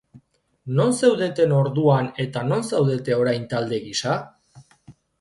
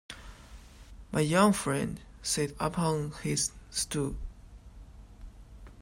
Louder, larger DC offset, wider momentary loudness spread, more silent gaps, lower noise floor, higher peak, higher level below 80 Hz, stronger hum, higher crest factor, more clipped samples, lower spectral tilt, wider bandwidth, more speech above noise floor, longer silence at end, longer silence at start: first, -21 LUFS vs -30 LUFS; neither; second, 7 LU vs 22 LU; neither; first, -56 dBFS vs -50 dBFS; first, -4 dBFS vs -10 dBFS; second, -60 dBFS vs -48 dBFS; neither; about the same, 18 dB vs 22 dB; neither; first, -6 dB/octave vs -4.5 dB/octave; second, 11.5 kHz vs 16 kHz; first, 36 dB vs 21 dB; first, 0.3 s vs 0 s; about the same, 0.15 s vs 0.1 s